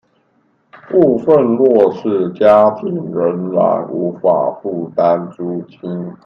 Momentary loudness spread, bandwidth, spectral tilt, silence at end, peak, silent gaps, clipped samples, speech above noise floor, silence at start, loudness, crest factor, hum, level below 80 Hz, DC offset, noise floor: 13 LU; 5.8 kHz; -9.5 dB/octave; 0.1 s; 0 dBFS; none; under 0.1%; 45 dB; 0.75 s; -14 LUFS; 14 dB; none; -60 dBFS; under 0.1%; -59 dBFS